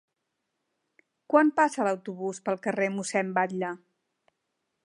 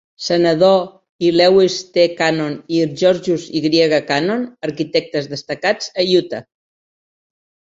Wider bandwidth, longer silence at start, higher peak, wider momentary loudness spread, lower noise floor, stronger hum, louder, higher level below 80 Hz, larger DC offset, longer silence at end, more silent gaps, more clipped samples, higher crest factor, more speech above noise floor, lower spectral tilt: first, 11.5 kHz vs 7.8 kHz; first, 1.3 s vs 0.2 s; second, -8 dBFS vs -2 dBFS; about the same, 11 LU vs 11 LU; second, -81 dBFS vs under -90 dBFS; neither; second, -27 LUFS vs -16 LUFS; second, -84 dBFS vs -58 dBFS; neither; second, 1.1 s vs 1.35 s; second, none vs 1.09-1.19 s; neither; first, 22 dB vs 16 dB; second, 55 dB vs over 74 dB; about the same, -5.5 dB/octave vs -5 dB/octave